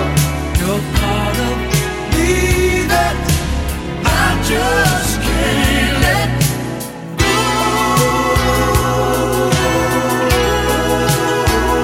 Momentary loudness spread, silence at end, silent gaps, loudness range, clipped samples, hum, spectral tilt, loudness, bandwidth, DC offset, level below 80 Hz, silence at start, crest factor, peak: 4 LU; 0 s; none; 1 LU; under 0.1%; none; -4.5 dB/octave; -15 LUFS; 17 kHz; under 0.1%; -22 dBFS; 0 s; 14 dB; 0 dBFS